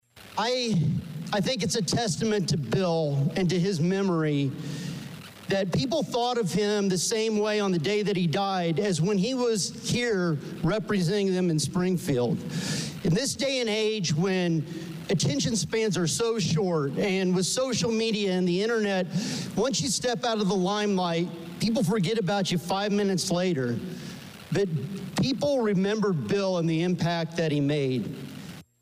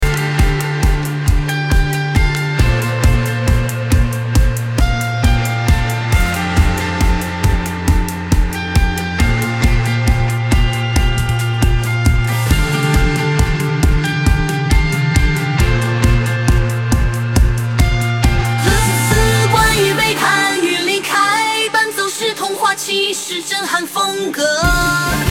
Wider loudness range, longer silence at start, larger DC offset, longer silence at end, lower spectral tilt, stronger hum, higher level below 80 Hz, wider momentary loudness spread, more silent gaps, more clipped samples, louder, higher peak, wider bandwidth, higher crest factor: about the same, 2 LU vs 3 LU; first, 0.15 s vs 0 s; second, under 0.1% vs 0.1%; first, 0.2 s vs 0 s; about the same, -5 dB/octave vs -4.5 dB/octave; neither; second, -58 dBFS vs -18 dBFS; about the same, 5 LU vs 4 LU; neither; neither; second, -26 LUFS vs -15 LUFS; second, -16 dBFS vs 0 dBFS; about the same, 15.5 kHz vs 17 kHz; about the same, 10 dB vs 14 dB